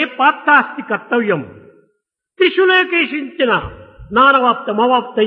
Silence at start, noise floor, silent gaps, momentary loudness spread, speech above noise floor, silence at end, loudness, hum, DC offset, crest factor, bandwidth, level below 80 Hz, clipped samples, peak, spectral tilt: 0 s; -69 dBFS; none; 9 LU; 55 dB; 0 s; -14 LUFS; none; under 0.1%; 14 dB; 5.4 kHz; -48 dBFS; under 0.1%; 0 dBFS; -7 dB/octave